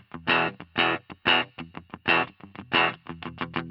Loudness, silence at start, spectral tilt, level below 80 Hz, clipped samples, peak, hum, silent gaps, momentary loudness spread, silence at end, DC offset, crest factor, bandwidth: -25 LUFS; 0.15 s; -6 dB/octave; -62 dBFS; under 0.1%; -8 dBFS; none; none; 16 LU; 0 s; under 0.1%; 20 dB; 9.4 kHz